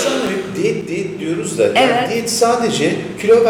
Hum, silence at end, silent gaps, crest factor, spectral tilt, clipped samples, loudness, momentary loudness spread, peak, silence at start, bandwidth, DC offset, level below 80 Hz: none; 0 s; none; 12 dB; -4 dB/octave; under 0.1%; -16 LUFS; 8 LU; -4 dBFS; 0 s; 17.5 kHz; under 0.1%; -54 dBFS